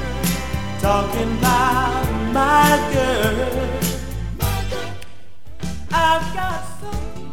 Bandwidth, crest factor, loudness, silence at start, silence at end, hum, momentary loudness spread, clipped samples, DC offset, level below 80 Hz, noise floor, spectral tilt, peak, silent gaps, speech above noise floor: 18 kHz; 18 dB; -20 LUFS; 0 s; 0 s; none; 14 LU; under 0.1%; 3%; -30 dBFS; -43 dBFS; -4.5 dB/octave; -2 dBFS; none; 25 dB